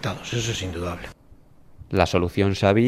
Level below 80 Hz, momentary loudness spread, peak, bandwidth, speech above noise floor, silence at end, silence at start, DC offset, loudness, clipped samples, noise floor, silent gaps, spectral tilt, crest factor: -48 dBFS; 12 LU; -2 dBFS; 15 kHz; 27 dB; 0 s; 0 s; under 0.1%; -24 LUFS; under 0.1%; -49 dBFS; none; -5.5 dB/octave; 22 dB